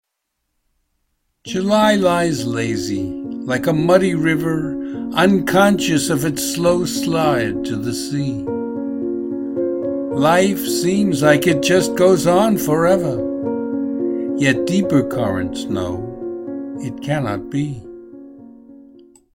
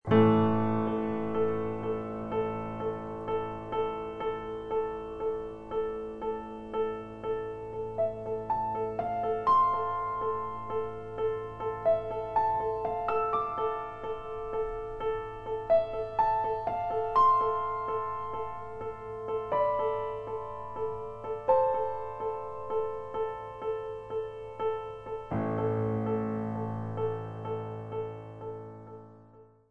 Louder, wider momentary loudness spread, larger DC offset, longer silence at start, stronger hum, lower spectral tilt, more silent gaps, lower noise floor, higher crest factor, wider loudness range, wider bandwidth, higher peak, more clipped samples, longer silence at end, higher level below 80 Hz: first, -18 LUFS vs -32 LUFS; about the same, 12 LU vs 11 LU; second, under 0.1% vs 0.1%; first, 1.45 s vs 0.05 s; neither; second, -5.5 dB/octave vs -9 dB/octave; neither; first, -75 dBFS vs -56 dBFS; about the same, 18 dB vs 20 dB; about the same, 6 LU vs 6 LU; first, 16.5 kHz vs 6.4 kHz; first, 0 dBFS vs -10 dBFS; neither; first, 0.55 s vs 0.1 s; first, -48 dBFS vs -54 dBFS